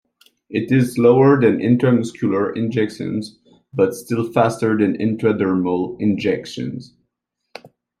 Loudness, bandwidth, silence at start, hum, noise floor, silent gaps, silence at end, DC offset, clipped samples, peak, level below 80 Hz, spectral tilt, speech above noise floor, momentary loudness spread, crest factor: -18 LUFS; 14.5 kHz; 0.5 s; none; -76 dBFS; none; 0.35 s; under 0.1%; under 0.1%; -2 dBFS; -60 dBFS; -7.5 dB/octave; 58 dB; 13 LU; 16 dB